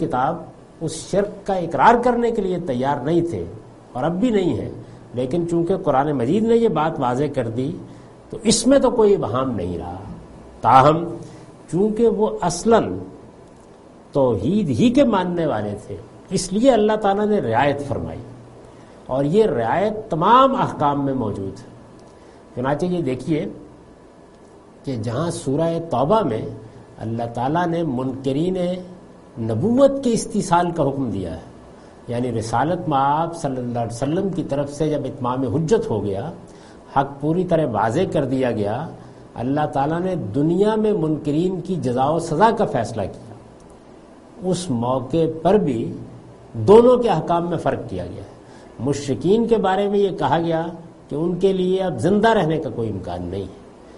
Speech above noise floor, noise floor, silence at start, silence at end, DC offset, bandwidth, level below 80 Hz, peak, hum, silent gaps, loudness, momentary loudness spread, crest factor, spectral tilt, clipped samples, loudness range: 27 dB; -46 dBFS; 0 s; 0 s; under 0.1%; 11.5 kHz; -46 dBFS; 0 dBFS; none; none; -20 LUFS; 16 LU; 20 dB; -6.5 dB/octave; under 0.1%; 5 LU